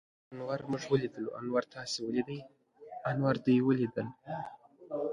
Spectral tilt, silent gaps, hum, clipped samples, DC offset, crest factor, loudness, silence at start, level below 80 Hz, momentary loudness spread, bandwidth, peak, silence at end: -6.5 dB/octave; none; none; under 0.1%; under 0.1%; 18 dB; -34 LUFS; 0.3 s; -70 dBFS; 15 LU; 11 kHz; -16 dBFS; 0 s